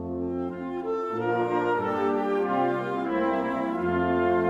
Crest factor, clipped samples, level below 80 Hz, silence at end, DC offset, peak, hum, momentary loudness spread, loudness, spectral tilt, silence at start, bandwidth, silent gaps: 12 dB; under 0.1%; -58 dBFS; 0 s; under 0.1%; -14 dBFS; none; 6 LU; -27 LUFS; -8 dB/octave; 0 s; 7.6 kHz; none